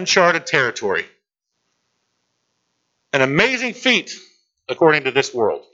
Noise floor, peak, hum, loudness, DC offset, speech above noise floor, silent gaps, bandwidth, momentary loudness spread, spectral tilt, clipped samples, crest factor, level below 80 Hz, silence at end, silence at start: -75 dBFS; 0 dBFS; none; -17 LUFS; under 0.1%; 57 dB; none; 8 kHz; 17 LU; -3.5 dB/octave; under 0.1%; 20 dB; -60 dBFS; 0.1 s; 0 s